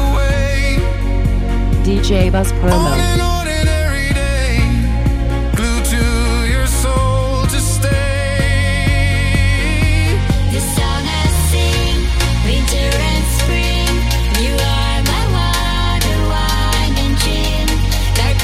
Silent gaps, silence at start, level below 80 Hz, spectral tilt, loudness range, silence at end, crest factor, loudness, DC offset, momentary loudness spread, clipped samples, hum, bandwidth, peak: none; 0 s; -16 dBFS; -4.5 dB/octave; 1 LU; 0 s; 14 dB; -15 LUFS; under 0.1%; 2 LU; under 0.1%; none; 16 kHz; 0 dBFS